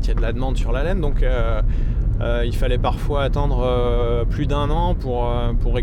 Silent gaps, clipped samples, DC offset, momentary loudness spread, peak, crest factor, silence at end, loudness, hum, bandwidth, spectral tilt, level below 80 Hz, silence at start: none; under 0.1%; under 0.1%; 3 LU; -6 dBFS; 12 dB; 0 s; -22 LUFS; none; 8.2 kHz; -7.5 dB/octave; -20 dBFS; 0 s